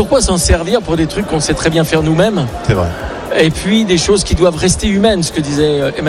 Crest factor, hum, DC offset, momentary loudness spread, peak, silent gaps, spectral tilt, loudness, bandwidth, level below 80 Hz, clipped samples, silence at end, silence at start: 12 dB; none; under 0.1%; 4 LU; 0 dBFS; none; -4.5 dB/octave; -13 LUFS; 15 kHz; -24 dBFS; under 0.1%; 0 s; 0 s